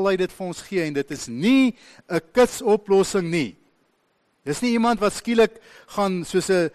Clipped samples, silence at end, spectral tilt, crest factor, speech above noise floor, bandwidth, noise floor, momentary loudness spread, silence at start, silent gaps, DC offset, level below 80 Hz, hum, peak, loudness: under 0.1%; 0.05 s; -5 dB/octave; 14 dB; 46 dB; 13 kHz; -67 dBFS; 10 LU; 0 s; none; under 0.1%; -54 dBFS; none; -8 dBFS; -22 LUFS